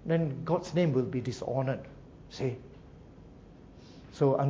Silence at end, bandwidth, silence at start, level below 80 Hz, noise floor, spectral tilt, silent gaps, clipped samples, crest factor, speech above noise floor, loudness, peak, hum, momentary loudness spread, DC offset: 0 s; 7.8 kHz; 0 s; -58 dBFS; -52 dBFS; -8 dB/octave; none; under 0.1%; 18 dB; 22 dB; -31 LUFS; -14 dBFS; none; 25 LU; under 0.1%